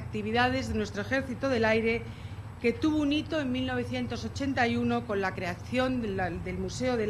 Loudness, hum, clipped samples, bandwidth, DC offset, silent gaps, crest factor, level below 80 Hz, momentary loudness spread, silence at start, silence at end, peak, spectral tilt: -30 LUFS; none; under 0.1%; 13 kHz; under 0.1%; none; 20 dB; -48 dBFS; 7 LU; 0 s; 0 s; -10 dBFS; -6 dB/octave